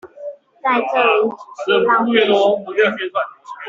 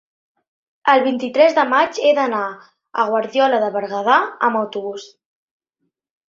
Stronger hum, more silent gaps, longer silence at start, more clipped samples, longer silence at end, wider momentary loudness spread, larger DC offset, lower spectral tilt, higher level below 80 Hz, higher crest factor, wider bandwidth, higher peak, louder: neither; neither; second, 0.05 s vs 0.85 s; neither; second, 0 s vs 1.25 s; about the same, 13 LU vs 12 LU; neither; about the same, -5 dB/octave vs -4 dB/octave; about the same, -66 dBFS vs -70 dBFS; about the same, 14 dB vs 18 dB; about the same, 7.6 kHz vs 7.6 kHz; about the same, -2 dBFS vs 0 dBFS; about the same, -16 LUFS vs -17 LUFS